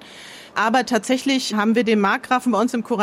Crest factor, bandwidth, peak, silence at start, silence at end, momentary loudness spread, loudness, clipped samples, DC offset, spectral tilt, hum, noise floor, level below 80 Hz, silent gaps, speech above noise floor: 14 dB; 15.5 kHz; -6 dBFS; 0.05 s; 0 s; 7 LU; -19 LUFS; under 0.1%; under 0.1%; -4 dB/octave; none; -41 dBFS; -66 dBFS; none; 21 dB